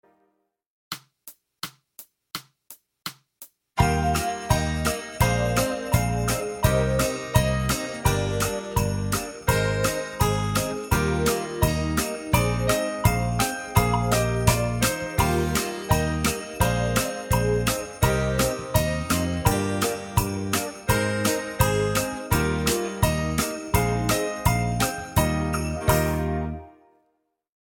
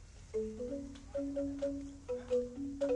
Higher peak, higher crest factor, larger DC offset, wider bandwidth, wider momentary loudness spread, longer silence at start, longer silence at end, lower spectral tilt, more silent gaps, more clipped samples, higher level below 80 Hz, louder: first, -4 dBFS vs -24 dBFS; first, 22 dB vs 14 dB; neither; first, 17.5 kHz vs 11 kHz; about the same, 5 LU vs 7 LU; first, 0.9 s vs 0 s; first, 0.9 s vs 0 s; second, -4.5 dB/octave vs -6.5 dB/octave; neither; neither; first, -34 dBFS vs -56 dBFS; first, -24 LUFS vs -40 LUFS